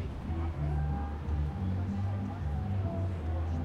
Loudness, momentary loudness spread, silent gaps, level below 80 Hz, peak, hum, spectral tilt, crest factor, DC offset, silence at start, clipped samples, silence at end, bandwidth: -35 LUFS; 2 LU; none; -38 dBFS; -22 dBFS; none; -9 dB/octave; 10 dB; under 0.1%; 0 s; under 0.1%; 0 s; 6.4 kHz